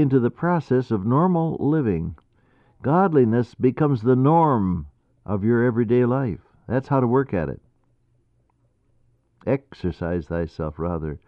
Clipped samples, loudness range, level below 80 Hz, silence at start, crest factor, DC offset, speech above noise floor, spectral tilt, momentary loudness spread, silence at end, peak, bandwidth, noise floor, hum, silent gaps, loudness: under 0.1%; 9 LU; -46 dBFS; 0 s; 16 dB; under 0.1%; 44 dB; -10.5 dB/octave; 12 LU; 0.1 s; -6 dBFS; 5.8 kHz; -64 dBFS; none; none; -22 LUFS